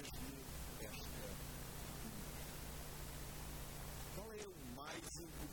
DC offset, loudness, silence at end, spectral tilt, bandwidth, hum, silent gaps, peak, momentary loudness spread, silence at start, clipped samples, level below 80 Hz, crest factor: under 0.1%; -50 LUFS; 0 s; -4 dB/octave; 18 kHz; none; none; -34 dBFS; 2 LU; 0 s; under 0.1%; -56 dBFS; 16 dB